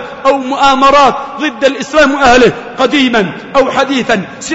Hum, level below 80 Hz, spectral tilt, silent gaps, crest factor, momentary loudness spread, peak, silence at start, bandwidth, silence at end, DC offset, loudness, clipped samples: none; -36 dBFS; -4 dB/octave; none; 10 dB; 8 LU; 0 dBFS; 0 s; 8 kHz; 0 s; under 0.1%; -10 LUFS; under 0.1%